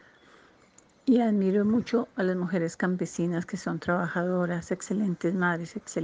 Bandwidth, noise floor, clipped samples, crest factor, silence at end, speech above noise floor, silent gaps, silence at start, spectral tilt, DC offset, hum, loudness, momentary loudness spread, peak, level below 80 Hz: 9.6 kHz; -59 dBFS; under 0.1%; 16 dB; 0 s; 32 dB; none; 1.05 s; -7 dB/octave; under 0.1%; none; -28 LUFS; 8 LU; -12 dBFS; -66 dBFS